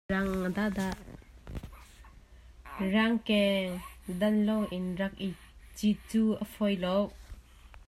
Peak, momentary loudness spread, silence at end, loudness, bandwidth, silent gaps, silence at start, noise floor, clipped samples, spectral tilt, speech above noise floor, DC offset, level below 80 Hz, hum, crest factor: -14 dBFS; 19 LU; 0.1 s; -31 LUFS; 15 kHz; none; 0.1 s; -54 dBFS; under 0.1%; -6 dB/octave; 24 dB; under 0.1%; -52 dBFS; none; 18 dB